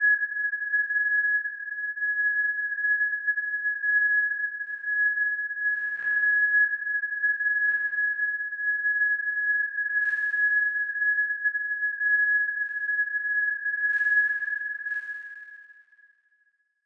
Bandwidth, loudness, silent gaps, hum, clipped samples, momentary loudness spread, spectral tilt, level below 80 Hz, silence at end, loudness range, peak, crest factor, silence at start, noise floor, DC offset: 3.4 kHz; -24 LUFS; none; none; under 0.1%; 8 LU; 0 dB/octave; under -90 dBFS; 1.15 s; 2 LU; -14 dBFS; 12 dB; 0 s; -70 dBFS; under 0.1%